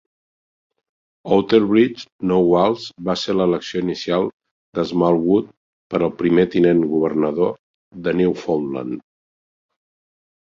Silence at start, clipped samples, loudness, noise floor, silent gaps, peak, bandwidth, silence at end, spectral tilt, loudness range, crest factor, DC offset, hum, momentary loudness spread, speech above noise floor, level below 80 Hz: 1.25 s; under 0.1%; -19 LUFS; under -90 dBFS; 2.12-2.19 s, 4.33-4.40 s, 4.51-4.73 s, 5.57-5.90 s, 7.59-7.91 s; -2 dBFS; 7.4 kHz; 1.45 s; -7 dB/octave; 3 LU; 18 dB; under 0.1%; none; 11 LU; over 72 dB; -54 dBFS